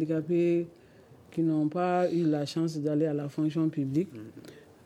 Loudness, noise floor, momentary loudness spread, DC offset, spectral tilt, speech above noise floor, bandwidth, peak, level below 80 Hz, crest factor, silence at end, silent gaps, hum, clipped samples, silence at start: -29 LUFS; -55 dBFS; 12 LU; under 0.1%; -8 dB/octave; 26 dB; 11.5 kHz; -16 dBFS; -74 dBFS; 14 dB; 0.25 s; none; none; under 0.1%; 0 s